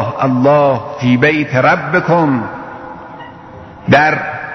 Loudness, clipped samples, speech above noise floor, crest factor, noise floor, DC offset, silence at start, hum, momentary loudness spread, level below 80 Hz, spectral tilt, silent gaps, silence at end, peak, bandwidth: -12 LUFS; under 0.1%; 22 dB; 14 dB; -33 dBFS; under 0.1%; 0 s; none; 20 LU; -48 dBFS; -7.5 dB/octave; none; 0 s; 0 dBFS; 6.4 kHz